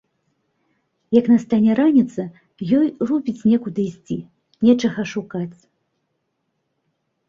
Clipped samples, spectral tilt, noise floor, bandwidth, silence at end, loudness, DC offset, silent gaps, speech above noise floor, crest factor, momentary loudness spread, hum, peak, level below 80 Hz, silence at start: under 0.1%; -7.5 dB/octave; -73 dBFS; 7.4 kHz; 1.75 s; -19 LUFS; under 0.1%; none; 55 dB; 18 dB; 14 LU; none; -2 dBFS; -60 dBFS; 1.1 s